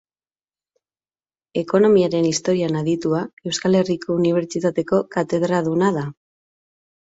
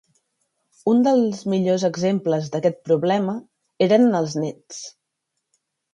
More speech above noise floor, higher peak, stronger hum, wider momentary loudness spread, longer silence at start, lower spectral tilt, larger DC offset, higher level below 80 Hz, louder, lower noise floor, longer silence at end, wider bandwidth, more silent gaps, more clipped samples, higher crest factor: first, over 71 dB vs 59 dB; about the same, -4 dBFS vs -4 dBFS; neither; second, 9 LU vs 16 LU; first, 1.55 s vs 0.85 s; about the same, -6 dB/octave vs -6.5 dB/octave; neither; first, -60 dBFS vs -68 dBFS; about the same, -20 LUFS vs -20 LUFS; first, under -90 dBFS vs -78 dBFS; about the same, 1.05 s vs 1.05 s; second, 8 kHz vs 10.5 kHz; first, 3.33-3.37 s vs none; neither; about the same, 16 dB vs 18 dB